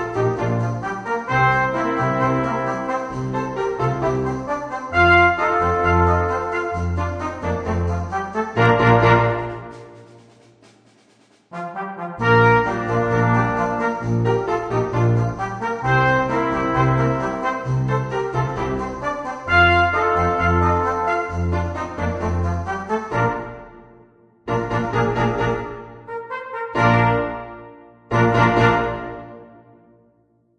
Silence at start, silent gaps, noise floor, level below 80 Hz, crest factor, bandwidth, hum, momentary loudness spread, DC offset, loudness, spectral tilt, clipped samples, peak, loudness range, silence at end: 0 s; none; -60 dBFS; -38 dBFS; 18 dB; 9.2 kHz; none; 14 LU; under 0.1%; -20 LUFS; -7 dB/octave; under 0.1%; -2 dBFS; 5 LU; 1.1 s